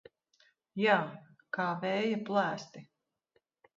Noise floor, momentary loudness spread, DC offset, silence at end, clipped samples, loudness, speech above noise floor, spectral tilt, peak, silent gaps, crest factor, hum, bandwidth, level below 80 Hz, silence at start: -77 dBFS; 17 LU; under 0.1%; 0.95 s; under 0.1%; -32 LUFS; 45 dB; -3.5 dB/octave; -12 dBFS; none; 22 dB; none; 7.6 kHz; -82 dBFS; 0.75 s